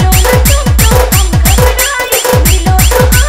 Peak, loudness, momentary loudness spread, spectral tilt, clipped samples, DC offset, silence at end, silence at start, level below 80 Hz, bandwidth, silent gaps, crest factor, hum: 0 dBFS; -8 LUFS; 2 LU; -4 dB/octave; 0.7%; under 0.1%; 0 s; 0 s; -10 dBFS; 16.5 kHz; none; 6 dB; none